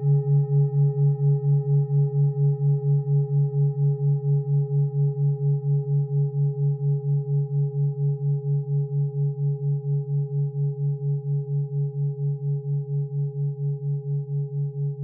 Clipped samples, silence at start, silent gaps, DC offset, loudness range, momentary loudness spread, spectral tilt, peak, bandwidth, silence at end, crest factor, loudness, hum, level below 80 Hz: under 0.1%; 0 s; none; under 0.1%; 5 LU; 6 LU; -17.5 dB/octave; -14 dBFS; 0.9 kHz; 0 s; 10 dB; -24 LUFS; none; -74 dBFS